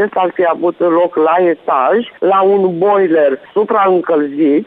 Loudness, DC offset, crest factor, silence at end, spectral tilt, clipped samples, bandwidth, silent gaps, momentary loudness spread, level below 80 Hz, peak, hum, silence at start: -12 LUFS; under 0.1%; 10 dB; 0 s; -9.5 dB/octave; under 0.1%; 4.5 kHz; none; 4 LU; -64 dBFS; -2 dBFS; none; 0 s